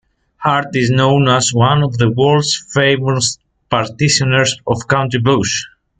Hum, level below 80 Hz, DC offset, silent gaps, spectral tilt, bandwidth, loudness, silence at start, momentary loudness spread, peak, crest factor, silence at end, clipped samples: none; -46 dBFS; under 0.1%; none; -4.5 dB/octave; 9.4 kHz; -14 LUFS; 0.4 s; 7 LU; 0 dBFS; 14 dB; 0.3 s; under 0.1%